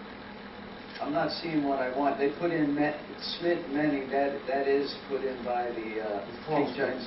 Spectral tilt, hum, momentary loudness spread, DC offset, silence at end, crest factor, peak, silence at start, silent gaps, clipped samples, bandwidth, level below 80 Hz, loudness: -9 dB/octave; none; 11 LU; under 0.1%; 0 s; 16 dB; -14 dBFS; 0 s; none; under 0.1%; 5.8 kHz; -62 dBFS; -30 LUFS